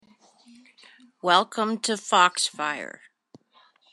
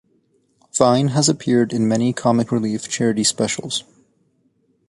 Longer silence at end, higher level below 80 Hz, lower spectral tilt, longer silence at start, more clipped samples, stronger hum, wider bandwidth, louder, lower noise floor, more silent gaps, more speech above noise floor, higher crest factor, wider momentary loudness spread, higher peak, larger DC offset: about the same, 1.05 s vs 1.1 s; second, -90 dBFS vs -58 dBFS; second, -2 dB/octave vs -4.5 dB/octave; first, 1.25 s vs 0.75 s; neither; neither; about the same, 12.5 kHz vs 11.5 kHz; second, -23 LUFS vs -19 LUFS; about the same, -61 dBFS vs -63 dBFS; neither; second, 37 dB vs 45 dB; first, 24 dB vs 18 dB; first, 12 LU vs 8 LU; second, -4 dBFS vs 0 dBFS; neither